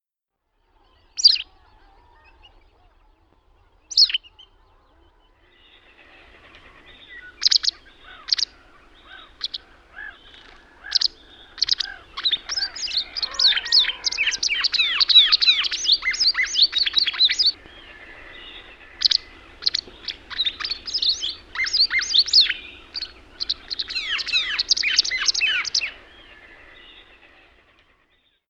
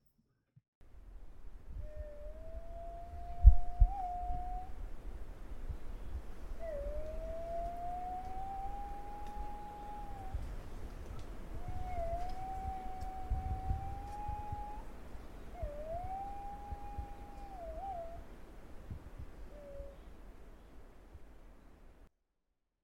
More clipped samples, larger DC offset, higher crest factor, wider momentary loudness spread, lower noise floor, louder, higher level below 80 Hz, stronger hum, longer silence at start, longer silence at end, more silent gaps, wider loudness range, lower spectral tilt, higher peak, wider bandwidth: neither; neither; second, 22 dB vs 30 dB; about the same, 18 LU vs 17 LU; about the same, -80 dBFS vs -83 dBFS; first, -18 LUFS vs -42 LUFS; second, -54 dBFS vs -40 dBFS; neither; first, 1.15 s vs 0.8 s; first, 2.5 s vs 0.75 s; neither; second, 9 LU vs 17 LU; second, 2.5 dB/octave vs -8 dB/octave; first, -2 dBFS vs -8 dBFS; first, 10.5 kHz vs 7.8 kHz